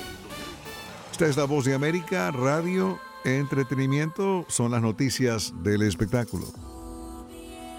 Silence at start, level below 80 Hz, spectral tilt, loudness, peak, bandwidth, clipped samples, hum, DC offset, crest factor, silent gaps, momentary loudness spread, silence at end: 0 s; -50 dBFS; -5.5 dB/octave; -26 LUFS; -8 dBFS; 18 kHz; under 0.1%; none; under 0.1%; 18 dB; none; 16 LU; 0 s